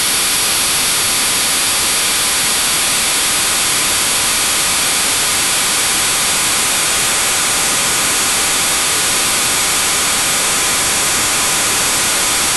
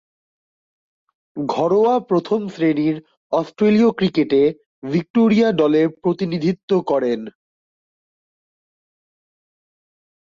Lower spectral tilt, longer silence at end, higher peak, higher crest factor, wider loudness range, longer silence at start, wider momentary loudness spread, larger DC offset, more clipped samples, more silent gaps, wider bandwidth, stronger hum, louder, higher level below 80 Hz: second, 0.5 dB/octave vs -8 dB/octave; second, 0 s vs 3 s; first, -2 dBFS vs -6 dBFS; about the same, 14 dB vs 14 dB; second, 0 LU vs 8 LU; second, 0 s vs 1.35 s; second, 0 LU vs 9 LU; neither; neither; second, none vs 3.17-3.30 s, 4.66-4.82 s, 5.10-5.14 s, 6.63-6.68 s; first, 13 kHz vs 7.4 kHz; neither; first, -12 LUFS vs -18 LUFS; first, -42 dBFS vs -62 dBFS